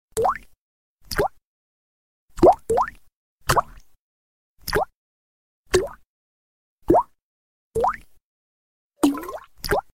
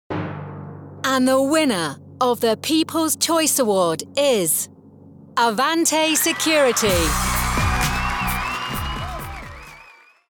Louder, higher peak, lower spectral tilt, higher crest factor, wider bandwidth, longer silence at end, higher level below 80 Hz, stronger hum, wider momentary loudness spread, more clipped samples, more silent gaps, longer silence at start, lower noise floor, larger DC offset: second, -23 LUFS vs -19 LUFS; first, -4 dBFS vs -8 dBFS; first, -5 dB/octave vs -3 dB/octave; first, 22 dB vs 14 dB; second, 16 kHz vs over 20 kHz; second, 0.1 s vs 0.5 s; second, -42 dBFS vs -34 dBFS; neither; first, 17 LU vs 14 LU; neither; first, 0.58-0.98 s, 1.45-2.28 s, 3.15-3.38 s, 3.99-4.56 s, 4.95-5.64 s, 6.07-6.78 s, 7.22-7.71 s, 8.23-8.90 s vs none; about the same, 0.15 s vs 0.1 s; first, under -90 dBFS vs -48 dBFS; first, 0.2% vs under 0.1%